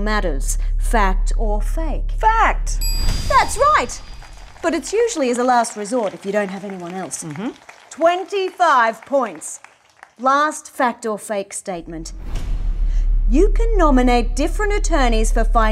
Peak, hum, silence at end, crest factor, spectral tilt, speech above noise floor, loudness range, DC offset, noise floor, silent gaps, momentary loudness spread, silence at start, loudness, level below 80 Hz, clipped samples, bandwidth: -2 dBFS; none; 0 s; 16 dB; -4.5 dB/octave; 31 dB; 4 LU; under 0.1%; -48 dBFS; none; 14 LU; 0 s; -19 LUFS; -22 dBFS; under 0.1%; 13 kHz